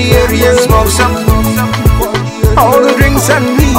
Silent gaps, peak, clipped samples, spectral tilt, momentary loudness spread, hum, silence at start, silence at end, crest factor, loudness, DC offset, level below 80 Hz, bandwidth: none; 0 dBFS; 2%; -5 dB/octave; 4 LU; none; 0 s; 0 s; 8 dB; -9 LUFS; under 0.1%; -16 dBFS; 17.5 kHz